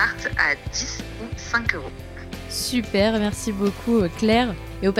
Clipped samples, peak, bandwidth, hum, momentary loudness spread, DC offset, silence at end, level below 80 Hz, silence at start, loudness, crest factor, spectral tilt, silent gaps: under 0.1%; -4 dBFS; 16 kHz; none; 13 LU; under 0.1%; 0 s; -38 dBFS; 0 s; -23 LUFS; 18 dB; -4.5 dB/octave; none